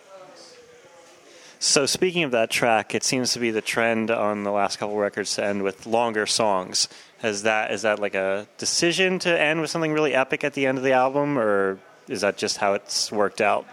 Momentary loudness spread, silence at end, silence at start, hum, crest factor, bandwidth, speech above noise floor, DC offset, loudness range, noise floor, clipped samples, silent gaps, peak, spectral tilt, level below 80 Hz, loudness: 5 LU; 0 s; 0.1 s; none; 20 dB; 16.5 kHz; 27 dB; under 0.1%; 2 LU; -50 dBFS; under 0.1%; none; -4 dBFS; -3 dB/octave; -70 dBFS; -22 LUFS